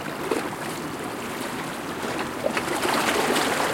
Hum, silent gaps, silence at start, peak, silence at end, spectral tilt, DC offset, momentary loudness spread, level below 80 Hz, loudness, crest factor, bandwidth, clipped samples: none; none; 0 s; -8 dBFS; 0 s; -3 dB/octave; under 0.1%; 9 LU; -56 dBFS; -26 LUFS; 18 dB; 17 kHz; under 0.1%